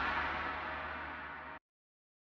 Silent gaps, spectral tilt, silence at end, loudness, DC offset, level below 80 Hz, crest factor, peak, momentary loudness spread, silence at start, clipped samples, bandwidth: none; -5.5 dB/octave; 0.65 s; -40 LUFS; under 0.1%; -58 dBFS; 18 dB; -24 dBFS; 13 LU; 0 s; under 0.1%; 8 kHz